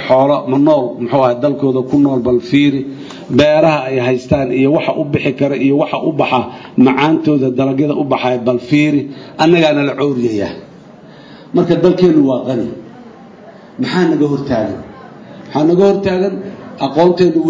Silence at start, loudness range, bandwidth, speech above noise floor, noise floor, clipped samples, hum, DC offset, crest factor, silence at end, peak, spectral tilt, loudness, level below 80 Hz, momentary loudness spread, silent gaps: 0 s; 3 LU; 7.6 kHz; 25 dB; -37 dBFS; under 0.1%; none; under 0.1%; 14 dB; 0 s; 0 dBFS; -7.5 dB/octave; -13 LUFS; -46 dBFS; 11 LU; none